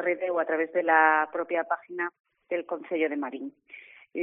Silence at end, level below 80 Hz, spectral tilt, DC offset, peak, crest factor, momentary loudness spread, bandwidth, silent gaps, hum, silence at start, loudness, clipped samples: 0 s; -82 dBFS; 4 dB/octave; under 0.1%; -6 dBFS; 22 dB; 19 LU; 3.7 kHz; 2.20-2.24 s; none; 0 s; -27 LUFS; under 0.1%